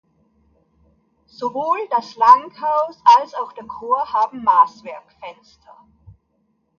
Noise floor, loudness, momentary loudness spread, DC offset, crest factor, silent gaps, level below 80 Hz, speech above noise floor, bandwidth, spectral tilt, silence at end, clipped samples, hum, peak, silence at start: -67 dBFS; -17 LUFS; 23 LU; under 0.1%; 20 dB; none; -62 dBFS; 49 dB; 7 kHz; -3.5 dB/octave; 1.5 s; under 0.1%; none; 0 dBFS; 1.4 s